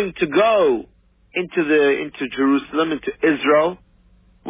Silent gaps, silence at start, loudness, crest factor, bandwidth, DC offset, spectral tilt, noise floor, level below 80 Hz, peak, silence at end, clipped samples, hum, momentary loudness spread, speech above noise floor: none; 0 s; -19 LUFS; 14 dB; 3.8 kHz; under 0.1%; -9 dB/octave; -54 dBFS; -54 dBFS; -6 dBFS; 0 s; under 0.1%; none; 9 LU; 35 dB